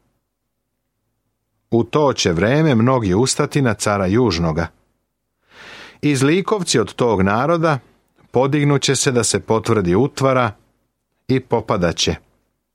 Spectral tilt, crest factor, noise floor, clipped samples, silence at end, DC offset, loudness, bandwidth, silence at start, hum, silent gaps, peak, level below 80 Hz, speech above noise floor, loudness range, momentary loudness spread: -5 dB/octave; 16 dB; -74 dBFS; under 0.1%; 0.55 s; under 0.1%; -17 LUFS; 15.5 kHz; 1.7 s; none; none; -2 dBFS; -46 dBFS; 58 dB; 3 LU; 6 LU